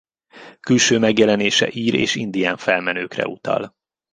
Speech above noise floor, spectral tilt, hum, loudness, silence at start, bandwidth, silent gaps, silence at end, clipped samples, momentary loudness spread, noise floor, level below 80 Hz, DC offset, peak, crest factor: 26 dB; -3.5 dB/octave; none; -18 LUFS; 0.35 s; 10 kHz; none; 0.45 s; under 0.1%; 10 LU; -44 dBFS; -58 dBFS; under 0.1%; -2 dBFS; 18 dB